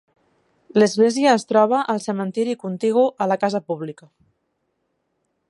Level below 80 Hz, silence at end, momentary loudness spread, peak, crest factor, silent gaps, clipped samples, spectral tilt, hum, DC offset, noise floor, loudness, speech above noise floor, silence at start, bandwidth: -74 dBFS; 1.55 s; 9 LU; -4 dBFS; 18 dB; none; under 0.1%; -5.5 dB/octave; none; under 0.1%; -72 dBFS; -20 LUFS; 53 dB; 0.75 s; 11.5 kHz